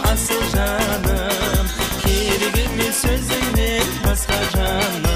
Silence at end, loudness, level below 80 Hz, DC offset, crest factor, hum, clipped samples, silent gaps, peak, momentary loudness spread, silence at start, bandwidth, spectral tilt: 0 s; -19 LUFS; -24 dBFS; under 0.1%; 16 dB; none; under 0.1%; none; -2 dBFS; 2 LU; 0 s; 15.5 kHz; -3.5 dB/octave